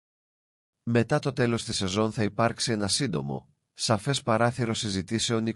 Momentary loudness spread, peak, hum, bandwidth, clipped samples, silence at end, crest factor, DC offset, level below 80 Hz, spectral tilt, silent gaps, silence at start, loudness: 6 LU; -10 dBFS; none; 12 kHz; under 0.1%; 0 s; 18 dB; under 0.1%; -60 dBFS; -4.5 dB/octave; none; 0.85 s; -27 LUFS